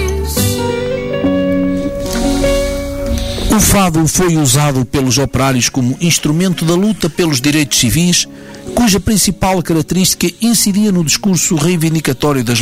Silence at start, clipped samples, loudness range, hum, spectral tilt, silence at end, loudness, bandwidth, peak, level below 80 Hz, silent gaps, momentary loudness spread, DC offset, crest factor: 0 s; under 0.1%; 2 LU; none; -4 dB/octave; 0 s; -13 LUFS; 16.5 kHz; 0 dBFS; -26 dBFS; none; 7 LU; under 0.1%; 12 dB